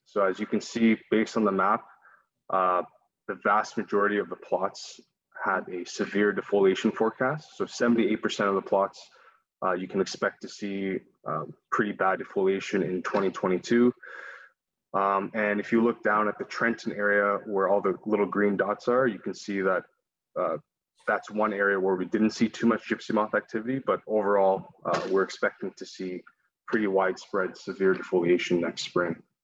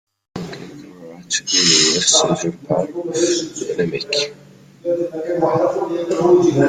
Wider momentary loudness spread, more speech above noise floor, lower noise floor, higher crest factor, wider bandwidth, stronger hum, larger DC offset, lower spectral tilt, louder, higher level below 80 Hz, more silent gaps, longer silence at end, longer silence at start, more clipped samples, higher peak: second, 10 LU vs 19 LU; first, 34 dB vs 20 dB; first, -61 dBFS vs -38 dBFS; about the same, 16 dB vs 18 dB; second, 8 kHz vs 10 kHz; neither; neither; first, -5.5 dB/octave vs -3 dB/octave; second, -27 LUFS vs -17 LUFS; second, -72 dBFS vs -56 dBFS; neither; first, 0.25 s vs 0 s; second, 0.15 s vs 0.35 s; neither; second, -10 dBFS vs 0 dBFS